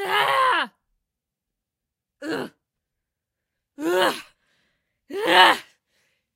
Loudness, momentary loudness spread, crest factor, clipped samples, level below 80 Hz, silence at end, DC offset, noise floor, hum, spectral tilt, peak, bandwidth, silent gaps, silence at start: -20 LUFS; 20 LU; 26 dB; under 0.1%; -74 dBFS; 0.75 s; under 0.1%; -85 dBFS; none; -2 dB/octave; 0 dBFS; 16 kHz; none; 0 s